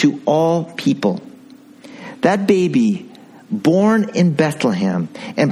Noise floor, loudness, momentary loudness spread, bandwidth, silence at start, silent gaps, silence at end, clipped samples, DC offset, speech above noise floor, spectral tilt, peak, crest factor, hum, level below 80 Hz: -42 dBFS; -17 LUFS; 11 LU; 13 kHz; 0 s; none; 0 s; under 0.1%; under 0.1%; 27 dB; -6.5 dB/octave; 0 dBFS; 16 dB; none; -60 dBFS